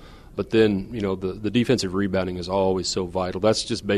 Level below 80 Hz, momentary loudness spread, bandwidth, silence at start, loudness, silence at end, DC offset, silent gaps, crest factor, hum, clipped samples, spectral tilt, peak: -46 dBFS; 7 LU; 13 kHz; 0 s; -23 LUFS; 0 s; under 0.1%; none; 18 dB; none; under 0.1%; -5 dB/octave; -6 dBFS